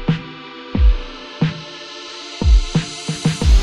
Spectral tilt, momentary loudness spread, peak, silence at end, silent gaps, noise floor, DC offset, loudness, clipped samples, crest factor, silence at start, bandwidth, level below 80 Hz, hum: -5.5 dB/octave; 15 LU; -2 dBFS; 0 s; none; -34 dBFS; under 0.1%; -20 LUFS; under 0.1%; 14 dB; 0 s; 10.5 kHz; -18 dBFS; none